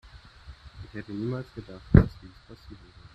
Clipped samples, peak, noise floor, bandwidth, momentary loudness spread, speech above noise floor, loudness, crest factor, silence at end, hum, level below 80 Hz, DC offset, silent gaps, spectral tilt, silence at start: under 0.1%; -2 dBFS; -49 dBFS; 6 kHz; 28 LU; 22 dB; -26 LUFS; 28 dB; 0.4 s; none; -36 dBFS; under 0.1%; none; -10 dB/octave; 0.15 s